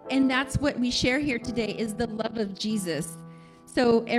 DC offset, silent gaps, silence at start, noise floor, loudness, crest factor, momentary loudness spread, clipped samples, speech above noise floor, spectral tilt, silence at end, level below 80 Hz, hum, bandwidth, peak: under 0.1%; none; 0 s; -47 dBFS; -27 LUFS; 16 dB; 9 LU; under 0.1%; 21 dB; -4.5 dB/octave; 0 s; -48 dBFS; none; 13.5 kHz; -10 dBFS